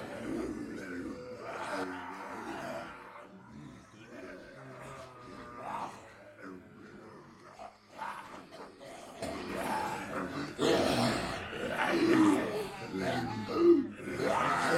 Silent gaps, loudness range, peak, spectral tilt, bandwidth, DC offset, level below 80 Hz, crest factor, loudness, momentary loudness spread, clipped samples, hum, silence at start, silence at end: none; 16 LU; -14 dBFS; -5 dB/octave; 15.5 kHz; under 0.1%; -62 dBFS; 22 dB; -33 LUFS; 23 LU; under 0.1%; none; 0 s; 0 s